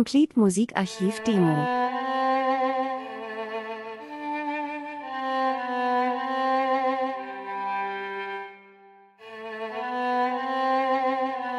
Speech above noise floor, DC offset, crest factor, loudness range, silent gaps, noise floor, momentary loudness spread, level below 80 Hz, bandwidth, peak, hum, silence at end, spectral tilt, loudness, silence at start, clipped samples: 30 dB; under 0.1%; 18 dB; 5 LU; none; -53 dBFS; 12 LU; -72 dBFS; 12 kHz; -8 dBFS; none; 0 s; -5.5 dB/octave; -26 LUFS; 0 s; under 0.1%